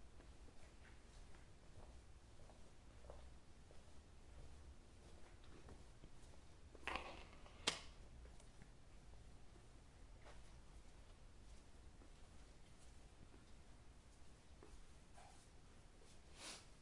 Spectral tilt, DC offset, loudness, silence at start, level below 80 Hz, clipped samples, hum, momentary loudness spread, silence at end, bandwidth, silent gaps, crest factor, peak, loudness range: -2.5 dB/octave; under 0.1%; -59 LUFS; 0 s; -64 dBFS; under 0.1%; none; 13 LU; 0 s; 11.5 kHz; none; 38 dB; -20 dBFS; 14 LU